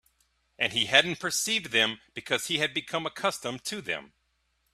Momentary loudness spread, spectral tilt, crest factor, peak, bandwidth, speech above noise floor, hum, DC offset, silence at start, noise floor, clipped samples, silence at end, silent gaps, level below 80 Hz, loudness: 12 LU; -1.5 dB/octave; 28 dB; -4 dBFS; 15.5 kHz; 45 dB; none; under 0.1%; 0.6 s; -74 dBFS; under 0.1%; 0.65 s; none; -68 dBFS; -27 LUFS